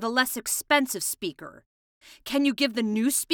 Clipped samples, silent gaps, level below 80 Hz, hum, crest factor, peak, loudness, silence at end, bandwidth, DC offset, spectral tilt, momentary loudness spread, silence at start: under 0.1%; 1.66-2.01 s; -64 dBFS; none; 20 dB; -6 dBFS; -25 LUFS; 0 s; over 20 kHz; under 0.1%; -2 dB/octave; 16 LU; 0 s